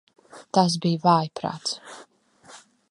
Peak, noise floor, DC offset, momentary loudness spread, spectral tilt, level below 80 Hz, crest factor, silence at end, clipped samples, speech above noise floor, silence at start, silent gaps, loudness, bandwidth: -4 dBFS; -51 dBFS; under 0.1%; 17 LU; -5.5 dB/octave; -70 dBFS; 22 dB; 0.35 s; under 0.1%; 28 dB; 0.35 s; none; -23 LUFS; 11.5 kHz